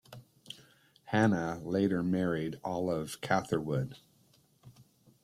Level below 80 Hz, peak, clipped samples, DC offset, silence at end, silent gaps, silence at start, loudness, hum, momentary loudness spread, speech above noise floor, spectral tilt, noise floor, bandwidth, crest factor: -66 dBFS; -14 dBFS; under 0.1%; under 0.1%; 0.4 s; none; 0.1 s; -32 LUFS; none; 20 LU; 35 dB; -6.5 dB/octave; -67 dBFS; 15 kHz; 20 dB